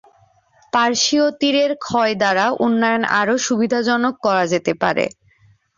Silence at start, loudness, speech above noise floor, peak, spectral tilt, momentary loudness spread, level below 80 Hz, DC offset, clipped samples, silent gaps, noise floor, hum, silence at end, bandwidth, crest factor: 0.75 s; -17 LUFS; 38 dB; -2 dBFS; -3.5 dB/octave; 4 LU; -60 dBFS; under 0.1%; under 0.1%; none; -55 dBFS; none; 0.7 s; 7.6 kHz; 16 dB